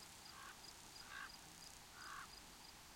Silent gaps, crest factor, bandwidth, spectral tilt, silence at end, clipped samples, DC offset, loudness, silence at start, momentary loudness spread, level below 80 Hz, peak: none; 18 dB; 16.5 kHz; -1 dB/octave; 0 s; under 0.1%; under 0.1%; -55 LUFS; 0 s; 4 LU; -72 dBFS; -40 dBFS